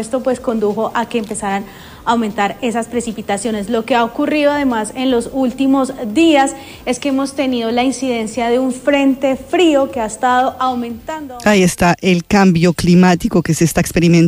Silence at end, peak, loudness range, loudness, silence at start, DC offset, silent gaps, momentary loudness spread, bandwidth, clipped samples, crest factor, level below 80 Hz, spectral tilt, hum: 0 s; -2 dBFS; 5 LU; -15 LUFS; 0 s; under 0.1%; none; 8 LU; 15.5 kHz; under 0.1%; 12 dB; -40 dBFS; -5.5 dB/octave; none